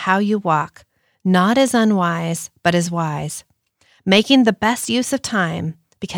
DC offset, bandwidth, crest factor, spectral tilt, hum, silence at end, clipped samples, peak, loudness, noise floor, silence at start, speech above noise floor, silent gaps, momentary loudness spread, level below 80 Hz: under 0.1%; 19 kHz; 16 dB; -4.5 dB/octave; none; 0 s; under 0.1%; -2 dBFS; -18 LUFS; -59 dBFS; 0 s; 41 dB; none; 14 LU; -58 dBFS